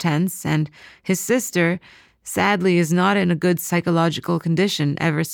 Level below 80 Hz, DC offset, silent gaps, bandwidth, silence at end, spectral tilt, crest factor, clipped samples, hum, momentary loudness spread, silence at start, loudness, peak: -58 dBFS; under 0.1%; none; 19 kHz; 0 s; -5.5 dB/octave; 14 dB; under 0.1%; none; 8 LU; 0 s; -20 LUFS; -6 dBFS